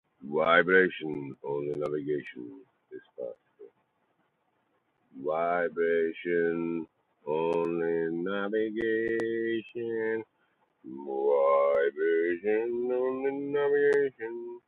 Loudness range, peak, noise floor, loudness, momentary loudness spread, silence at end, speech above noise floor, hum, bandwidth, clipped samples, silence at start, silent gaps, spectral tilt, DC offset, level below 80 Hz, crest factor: 10 LU; -8 dBFS; -74 dBFS; -29 LUFS; 17 LU; 0.1 s; 46 dB; none; 4.3 kHz; under 0.1%; 0.2 s; none; -7.5 dB/octave; under 0.1%; -72 dBFS; 22 dB